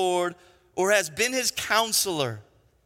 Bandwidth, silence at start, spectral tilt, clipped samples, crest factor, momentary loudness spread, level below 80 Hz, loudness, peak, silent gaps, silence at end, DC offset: 17 kHz; 0 s; -2 dB/octave; under 0.1%; 20 dB; 10 LU; -64 dBFS; -24 LUFS; -8 dBFS; none; 0.45 s; under 0.1%